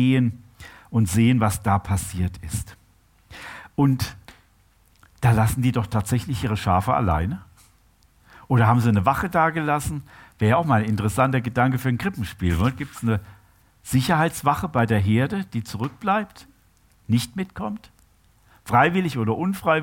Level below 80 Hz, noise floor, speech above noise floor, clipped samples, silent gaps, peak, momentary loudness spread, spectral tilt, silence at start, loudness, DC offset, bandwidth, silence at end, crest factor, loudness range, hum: -42 dBFS; -59 dBFS; 37 dB; under 0.1%; none; -4 dBFS; 13 LU; -6.5 dB/octave; 0 s; -22 LUFS; under 0.1%; 17 kHz; 0 s; 18 dB; 5 LU; none